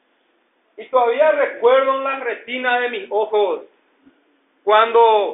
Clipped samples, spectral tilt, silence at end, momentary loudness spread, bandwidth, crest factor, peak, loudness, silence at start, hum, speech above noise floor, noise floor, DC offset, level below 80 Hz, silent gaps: under 0.1%; 1.5 dB/octave; 0 s; 10 LU; 4 kHz; 18 dB; 0 dBFS; -17 LUFS; 0.8 s; none; 46 dB; -63 dBFS; under 0.1%; -80 dBFS; none